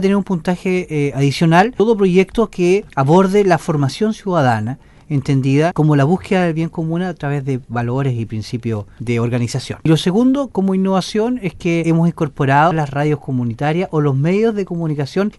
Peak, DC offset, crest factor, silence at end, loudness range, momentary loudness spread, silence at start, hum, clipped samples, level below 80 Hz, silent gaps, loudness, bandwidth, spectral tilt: -2 dBFS; under 0.1%; 14 dB; 0.05 s; 5 LU; 8 LU; 0 s; none; under 0.1%; -44 dBFS; none; -16 LUFS; 11.5 kHz; -7 dB/octave